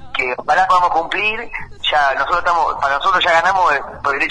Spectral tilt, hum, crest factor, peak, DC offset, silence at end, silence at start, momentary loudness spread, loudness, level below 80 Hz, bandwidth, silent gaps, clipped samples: -2.5 dB/octave; none; 14 dB; -2 dBFS; under 0.1%; 0 s; 0 s; 7 LU; -15 LUFS; -42 dBFS; 10.5 kHz; none; under 0.1%